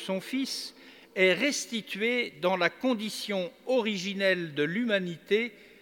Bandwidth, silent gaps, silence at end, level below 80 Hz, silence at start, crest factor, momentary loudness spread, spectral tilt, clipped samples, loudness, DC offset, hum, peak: 19 kHz; none; 0.15 s; -78 dBFS; 0 s; 20 dB; 8 LU; -4 dB/octave; under 0.1%; -29 LUFS; under 0.1%; none; -10 dBFS